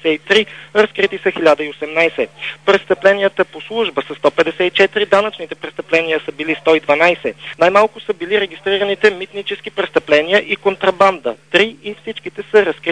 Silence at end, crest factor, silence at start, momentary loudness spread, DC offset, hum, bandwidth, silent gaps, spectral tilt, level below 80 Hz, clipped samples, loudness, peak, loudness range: 0 s; 16 dB; 0 s; 11 LU; 0.2%; none; 10 kHz; none; -4.5 dB/octave; -56 dBFS; under 0.1%; -15 LUFS; 0 dBFS; 1 LU